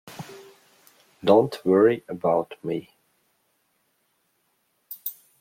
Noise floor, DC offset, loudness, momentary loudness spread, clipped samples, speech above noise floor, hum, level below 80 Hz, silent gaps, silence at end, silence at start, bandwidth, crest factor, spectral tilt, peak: -71 dBFS; under 0.1%; -23 LUFS; 22 LU; under 0.1%; 49 dB; none; -70 dBFS; none; 0.3 s; 0.05 s; 16.5 kHz; 22 dB; -7 dB/octave; -4 dBFS